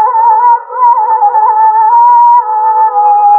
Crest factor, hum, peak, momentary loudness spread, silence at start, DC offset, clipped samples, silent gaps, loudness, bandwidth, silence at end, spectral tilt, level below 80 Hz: 6 dB; none; 0 dBFS; 4 LU; 0 s; under 0.1%; under 0.1%; none; -7 LUFS; 2.6 kHz; 0 s; -5 dB/octave; -86 dBFS